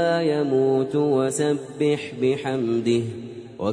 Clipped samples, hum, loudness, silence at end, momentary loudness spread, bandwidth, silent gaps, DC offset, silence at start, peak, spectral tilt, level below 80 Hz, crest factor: under 0.1%; none; -23 LUFS; 0 s; 7 LU; 11 kHz; none; under 0.1%; 0 s; -10 dBFS; -6 dB/octave; -64 dBFS; 14 dB